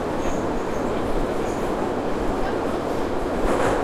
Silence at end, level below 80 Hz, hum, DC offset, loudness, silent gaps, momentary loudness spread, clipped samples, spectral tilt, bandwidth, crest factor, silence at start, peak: 0 s; -32 dBFS; none; under 0.1%; -25 LUFS; none; 3 LU; under 0.1%; -6 dB/octave; 14.5 kHz; 16 dB; 0 s; -8 dBFS